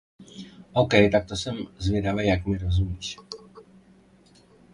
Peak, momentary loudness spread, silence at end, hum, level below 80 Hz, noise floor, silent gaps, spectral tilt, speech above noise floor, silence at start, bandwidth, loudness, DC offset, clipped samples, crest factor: -4 dBFS; 24 LU; 1.15 s; none; -38 dBFS; -56 dBFS; none; -6 dB/octave; 32 dB; 0.2 s; 11 kHz; -24 LUFS; under 0.1%; under 0.1%; 22 dB